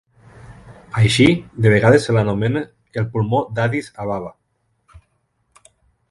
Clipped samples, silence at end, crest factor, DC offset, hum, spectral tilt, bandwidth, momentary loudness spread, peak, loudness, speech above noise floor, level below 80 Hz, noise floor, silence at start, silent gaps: under 0.1%; 1.8 s; 18 dB; under 0.1%; none; -6.5 dB/octave; 11.5 kHz; 13 LU; 0 dBFS; -18 LUFS; 51 dB; -46 dBFS; -67 dBFS; 0.45 s; none